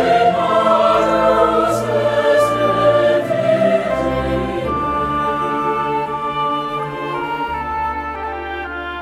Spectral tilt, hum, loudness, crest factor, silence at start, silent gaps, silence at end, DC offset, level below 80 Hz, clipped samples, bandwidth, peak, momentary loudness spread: -6 dB/octave; none; -17 LUFS; 16 dB; 0 s; none; 0 s; under 0.1%; -38 dBFS; under 0.1%; 15 kHz; 0 dBFS; 9 LU